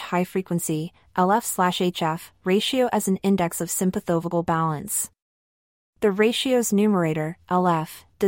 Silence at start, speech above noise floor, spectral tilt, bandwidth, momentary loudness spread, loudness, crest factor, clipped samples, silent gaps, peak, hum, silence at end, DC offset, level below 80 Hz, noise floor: 0 s; over 67 dB; -4.5 dB/octave; 16.5 kHz; 7 LU; -23 LUFS; 14 dB; under 0.1%; 5.22-5.93 s; -8 dBFS; none; 0 s; under 0.1%; -58 dBFS; under -90 dBFS